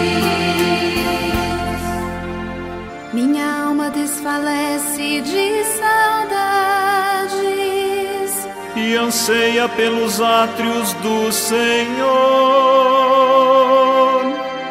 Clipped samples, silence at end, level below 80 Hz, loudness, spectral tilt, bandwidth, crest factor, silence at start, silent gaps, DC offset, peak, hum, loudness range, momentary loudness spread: under 0.1%; 0 s; -42 dBFS; -16 LUFS; -3.5 dB/octave; 16 kHz; 14 dB; 0 s; none; under 0.1%; -2 dBFS; none; 7 LU; 10 LU